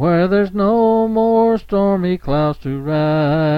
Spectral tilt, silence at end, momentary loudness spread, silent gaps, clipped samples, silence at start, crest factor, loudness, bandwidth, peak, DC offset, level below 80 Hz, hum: -9.5 dB/octave; 0 s; 5 LU; none; under 0.1%; 0 s; 12 dB; -16 LUFS; 5.6 kHz; -4 dBFS; under 0.1%; -38 dBFS; none